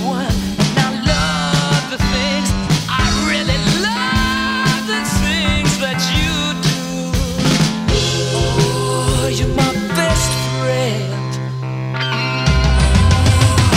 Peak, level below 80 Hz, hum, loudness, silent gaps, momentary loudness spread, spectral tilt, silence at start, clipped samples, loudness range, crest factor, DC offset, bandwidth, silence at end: 0 dBFS; -24 dBFS; none; -16 LUFS; none; 6 LU; -4.5 dB/octave; 0 s; under 0.1%; 2 LU; 14 dB; under 0.1%; 16 kHz; 0 s